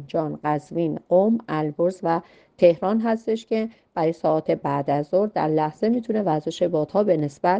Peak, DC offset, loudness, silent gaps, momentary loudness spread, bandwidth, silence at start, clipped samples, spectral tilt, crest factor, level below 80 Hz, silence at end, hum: -4 dBFS; under 0.1%; -23 LUFS; none; 7 LU; 8.8 kHz; 0 s; under 0.1%; -8 dB/octave; 18 dB; -64 dBFS; 0 s; none